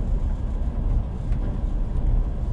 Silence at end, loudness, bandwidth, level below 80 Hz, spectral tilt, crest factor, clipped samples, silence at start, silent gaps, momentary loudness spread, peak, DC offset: 0 s; -28 LUFS; 3.6 kHz; -24 dBFS; -9.5 dB/octave; 12 dB; under 0.1%; 0 s; none; 3 LU; -10 dBFS; under 0.1%